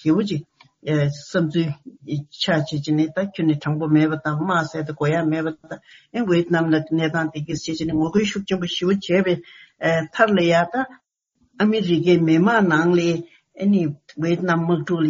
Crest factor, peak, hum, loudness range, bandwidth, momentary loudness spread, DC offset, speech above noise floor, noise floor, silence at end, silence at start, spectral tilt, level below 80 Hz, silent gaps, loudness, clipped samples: 20 dB; 0 dBFS; none; 4 LU; 7.4 kHz; 11 LU; under 0.1%; 46 dB; -66 dBFS; 0 s; 0.05 s; -5.5 dB/octave; -58 dBFS; none; -21 LUFS; under 0.1%